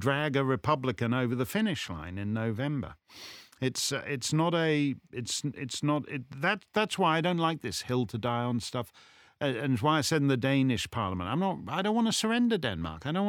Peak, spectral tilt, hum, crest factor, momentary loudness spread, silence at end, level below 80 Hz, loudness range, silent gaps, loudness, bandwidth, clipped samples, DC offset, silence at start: -12 dBFS; -5 dB/octave; none; 18 dB; 9 LU; 0 s; -60 dBFS; 4 LU; none; -30 LUFS; 19.5 kHz; under 0.1%; under 0.1%; 0 s